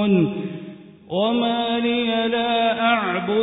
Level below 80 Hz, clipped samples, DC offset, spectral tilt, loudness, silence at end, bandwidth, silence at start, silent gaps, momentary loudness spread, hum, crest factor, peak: -60 dBFS; under 0.1%; under 0.1%; -10.5 dB/octave; -21 LUFS; 0 s; 4 kHz; 0 s; none; 11 LU; none; 14 dB; -6 dBFS